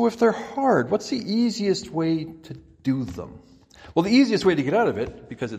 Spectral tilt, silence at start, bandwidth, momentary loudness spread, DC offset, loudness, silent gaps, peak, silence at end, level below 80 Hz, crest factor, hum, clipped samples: -6 dB/octave; 0 s; 12 kHz; 15 LU; under 0.1%; -23 LUFS; none; -6 dBFS; 0 s; -56 dBFS; 16 dB; none; under 0.1%